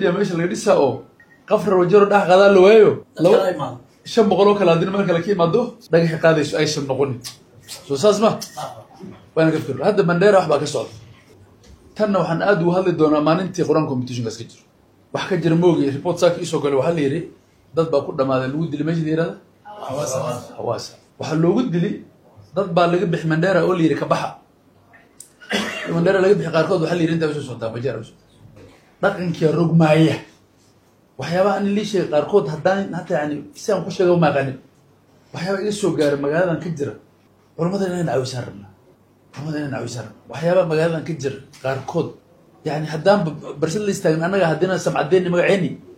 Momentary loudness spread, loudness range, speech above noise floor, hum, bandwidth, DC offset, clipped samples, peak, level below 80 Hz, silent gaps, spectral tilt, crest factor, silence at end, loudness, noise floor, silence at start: 14 LU; 8 LU; 37 dB; none; 15 kHz; under 0.1%; under 0.1%; -2 dBFS; -58 dBFS; none; -6.5 dB/octave; 18 dB; 0.05 s; -19 LUFS; -55 dBFS; 0 s